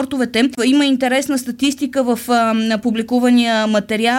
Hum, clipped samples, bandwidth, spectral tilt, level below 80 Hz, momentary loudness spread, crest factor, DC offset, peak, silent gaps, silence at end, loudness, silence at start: none; under 0.1%; 17 kHz; -4 dB/octave; -56 dBFS; 5 LU; 12 dB; under 0.1%; -4 dBFS; none; 0 s; -16 LUFS; 0 s